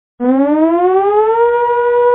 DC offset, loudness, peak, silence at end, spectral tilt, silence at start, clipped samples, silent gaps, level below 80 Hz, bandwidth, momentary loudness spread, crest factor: under 0.1%; -12 LUFS; -2 dBFS; 0 s; -10 dB/octave; 0.2 s; under 0.1%; none; -52 dBFS; 3.9 kHz; 2 LU; 10 dB